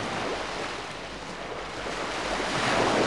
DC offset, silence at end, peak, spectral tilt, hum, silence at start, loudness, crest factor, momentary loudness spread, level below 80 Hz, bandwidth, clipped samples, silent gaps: 0.2%; 0 s; -12 dBFS; -3.5 dB/octave; none; 0 s; -30 LUFS; 18 dB; 12 LU; -50 dBFS; 13 kHz; under 0.1%; none